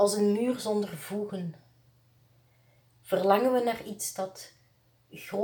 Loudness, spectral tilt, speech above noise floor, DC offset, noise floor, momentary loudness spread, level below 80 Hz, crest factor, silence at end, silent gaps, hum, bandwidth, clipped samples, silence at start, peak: -29 LUFS; -4.5 dB/octave; 37 dB; under 0.1%; -65 dBFS; 20 LU; -74 dBFS; 22 dB; 0 s; none; none; over 20 kHz; under 0.1%; 0 s; -8 dBFS